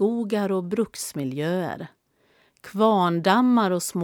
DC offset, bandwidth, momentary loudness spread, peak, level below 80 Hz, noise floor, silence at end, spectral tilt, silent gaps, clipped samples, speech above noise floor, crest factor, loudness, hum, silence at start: under 0.1%; 18.5 kHz; 13 LU; -4 dBFS; -68 dBFS; -63 dBFS; 0 s; -5.5 dB/octave; none; under 0.1%; 41 dB; 18 dB; -23 LUFS; none; 0 s